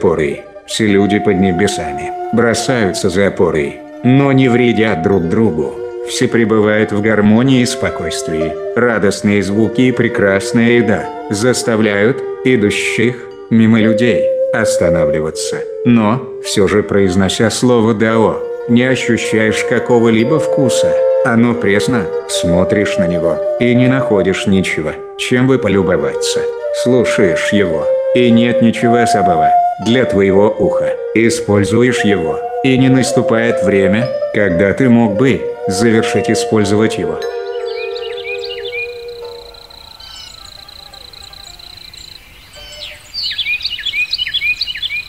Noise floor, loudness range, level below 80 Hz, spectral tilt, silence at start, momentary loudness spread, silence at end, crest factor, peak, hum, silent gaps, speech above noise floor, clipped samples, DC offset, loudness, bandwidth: -37 dBFS; 9 LU; -44 dBFS; -5.5 dB/octave; 0 s; 11 LU; 0 s; 12 dB; 0 dBFS; none; none; 25 dB; under 0.1%; under 0.1%; -13 LUFS; 14.5 kHz